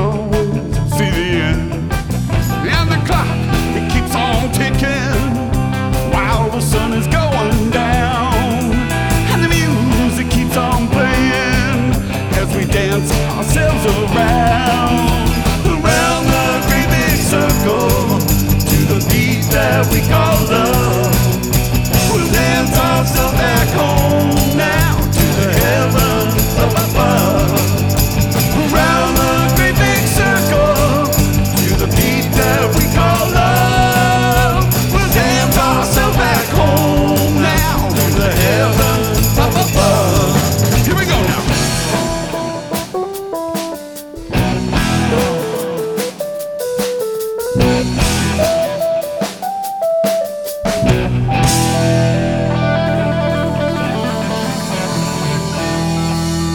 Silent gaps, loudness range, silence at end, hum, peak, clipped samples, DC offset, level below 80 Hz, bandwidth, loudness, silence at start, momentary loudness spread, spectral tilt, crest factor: none; 5 LU; 0 s; none; 0 dBFS; under 0.1%; under 0.1%; -24 dBFS; over 20 kHz; -14 LUFS; 0 s; 6 LU; -5 dB/octave; 14 dB